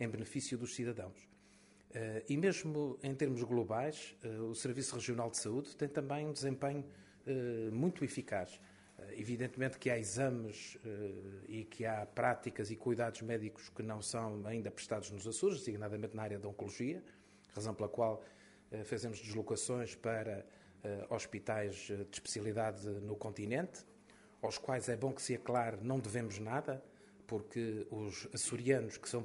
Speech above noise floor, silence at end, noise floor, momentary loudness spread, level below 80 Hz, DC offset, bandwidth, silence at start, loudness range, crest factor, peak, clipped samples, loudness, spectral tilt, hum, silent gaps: 25 dB; 0 s; -66 dBFS; 11 LU; -74 dBFS; under 0.1%; 11.5 kHz; 0 s; 3 LU; 22 dB; -18 dBFS; under 0.1%; -41 LUFS; -5 dB/octave; none; none